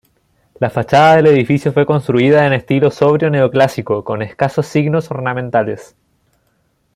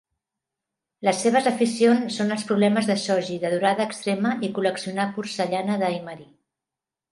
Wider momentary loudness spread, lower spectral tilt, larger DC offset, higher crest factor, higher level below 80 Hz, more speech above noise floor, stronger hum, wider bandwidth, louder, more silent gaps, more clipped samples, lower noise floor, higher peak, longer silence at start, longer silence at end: first, 10 LU vs 7 LU; first, -7.5 dB/octave vs -5 dB/octave; neither; about the same, 14 dB vs 18 dB; first, -52 dBFS vs -72 dBFS; second, 48 dB vs 66 dB; neither; first, 13.5 kHz vs 11.5 kHz; first, -13 LUFS vs -23 LUFS; neither; neither; second, -61 dBFS vs -88 dBFS; first, 0 dBFS vs -6 dBFS; second, 0.6 s vs 1 s; first, 1.15 s vs 0.9 s